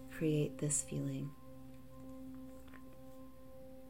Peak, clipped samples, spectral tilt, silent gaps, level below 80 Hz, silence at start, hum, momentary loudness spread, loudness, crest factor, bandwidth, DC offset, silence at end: -24 dBFS; under 0.1%; -5 dB/octave; none; -64 dBFS; 0 s; none; 20 LU; -39 LUFS; 18 dB; 16 kHz; 0.2%; 0 s